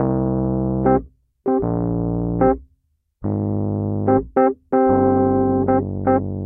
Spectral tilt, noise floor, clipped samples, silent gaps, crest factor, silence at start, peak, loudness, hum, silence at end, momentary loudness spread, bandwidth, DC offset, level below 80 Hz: -14.5 dB/octave; -65 dBFS; under 0.1%; none; 14 dB; 0 s; -4 dBFS; -19 LUFS; none; 0 s; 6 LU; 2.8 kHz; under 0.1%; -38 dBFS